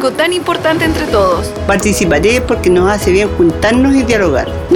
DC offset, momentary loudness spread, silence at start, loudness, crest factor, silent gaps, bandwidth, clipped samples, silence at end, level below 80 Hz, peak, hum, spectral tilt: under 0.1%; 3 LU; 0 s; -11 LUFS; 10 dB; none; 18.5 kHz; under 0.1%; 0 s; -26 dBFS; 0 dBFS; none; -5 dB/octave